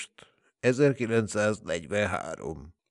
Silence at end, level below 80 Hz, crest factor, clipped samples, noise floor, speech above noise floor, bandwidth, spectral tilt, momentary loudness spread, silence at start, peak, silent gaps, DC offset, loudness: 0.2 s; -58 dBFS; 18 dB; under 0.1%; -58 dBFS; 31 dB; 11 kHz; -5.5 dB/octave; 15 LU; 0 s; -10 dBFS; none; under 0.1%; -28 LUFS